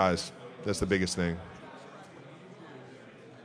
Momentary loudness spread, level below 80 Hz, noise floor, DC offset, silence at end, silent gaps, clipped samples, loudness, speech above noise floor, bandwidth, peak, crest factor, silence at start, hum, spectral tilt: 21 LU; -54 dBFS; -51 dBFS; under 0.1%; 0 s; none; under 0.1%; -32 LUFS; 21 dB; 11 kHz; -10 dBFS; 24 dB; 0 s; none; -5 dB/octave